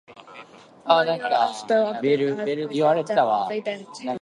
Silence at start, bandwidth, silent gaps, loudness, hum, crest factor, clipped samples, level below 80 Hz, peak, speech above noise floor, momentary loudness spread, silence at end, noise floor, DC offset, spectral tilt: 0.1 s; 11 kHz; none; -22 LUFS; none; 20 dB; under 0.1%; -74 dBFS; -4 dBFS; 24 dB; 12 LU; 0.05 s; -46 dBFS; under 0.1%; -5 dB/octave